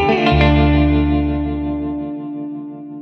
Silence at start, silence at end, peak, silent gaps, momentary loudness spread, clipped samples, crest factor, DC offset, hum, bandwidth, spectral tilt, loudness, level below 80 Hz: 0 s; 0 s; -2 dBFS; none; 15 LU; under 0.1%; 14 dB; under 0.1%; none; 6.4 kHz; -8.5 dB/octave; -17 LUFS; -24 dBFS